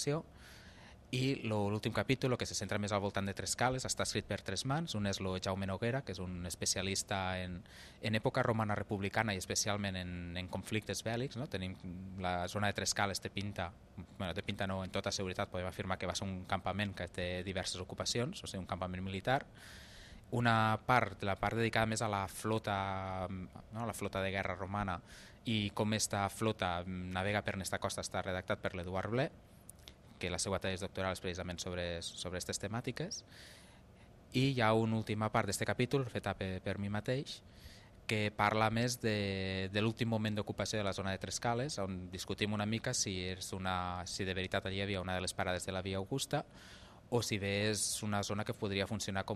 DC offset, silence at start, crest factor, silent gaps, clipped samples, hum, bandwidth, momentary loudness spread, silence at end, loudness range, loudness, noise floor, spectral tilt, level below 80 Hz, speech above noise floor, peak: under 0.1%; 0 s; 24 dB; none; under 0.1%; none; 14.5 kHz; 10 LU; 0 s; 4 LU; -37 LUFS; -59 dBFS; -4.5 dB/octave; -62 dBFS; 22 dB; -14 dBFS